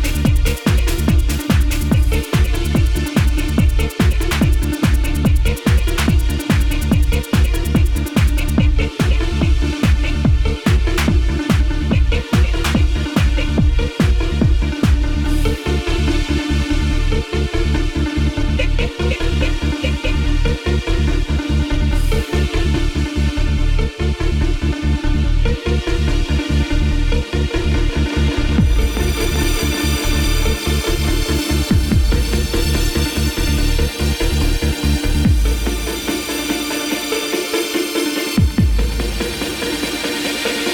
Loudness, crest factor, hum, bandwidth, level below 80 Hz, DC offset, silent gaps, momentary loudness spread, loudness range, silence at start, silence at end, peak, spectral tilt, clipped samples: -18 LUFS; 14 dB; none; 19 kHz; -18 dBFS; under 0.1%; none; 3 LU; 2 LU; 0 s; 0 s; -2 dBFS; -5.5 dB/octave; under 0.1%